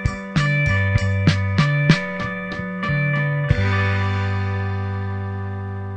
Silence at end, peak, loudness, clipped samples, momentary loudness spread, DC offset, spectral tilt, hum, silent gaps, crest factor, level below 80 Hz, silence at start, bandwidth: 0 s; 0 dBFS; -21 LUFS; under 0.1%; 9 LU; under 0.1%; -6.5 dB/octave; none; none; 20 dB; -36 dBFS; 0 s; 8.8 kHz